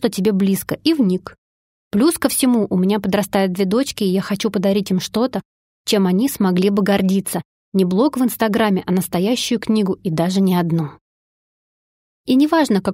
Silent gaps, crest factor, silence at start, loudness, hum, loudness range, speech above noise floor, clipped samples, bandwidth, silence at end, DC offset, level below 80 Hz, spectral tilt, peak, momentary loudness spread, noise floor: 1.38-1.91 s, 5.45-5.84 s, 7.45-7.72 s, 11.01-12.24 s; 16 dB; 0 s; -18 LUFS; none; 2 LU; over 73 dB; under 0.1%; 16.5 kHz; 0 s; under 0.1%; -54 dBFS; -5.5 dB/octave; -2 dBFS; 5 LU; under -90 dBFS